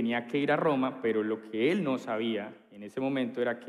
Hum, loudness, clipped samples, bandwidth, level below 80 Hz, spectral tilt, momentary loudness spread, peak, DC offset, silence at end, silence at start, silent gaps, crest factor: none; -30 LUFS; under 0.1%; 12 kHz; -80 dBFS; -7 dB/octave; 9 LU; -14 dBFS; under 0.1%; 0 s; 0 s; none; 16 dB